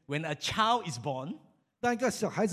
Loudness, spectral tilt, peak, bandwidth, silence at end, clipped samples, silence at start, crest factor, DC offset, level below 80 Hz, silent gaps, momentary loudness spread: -31 LUFS; -4 dB/octave; -12 dBFS; 15 kHz; 0 s; under 0.1%; 0.1 s; 18 dB; under 0.1%; -62 dBFS; none; 11 LU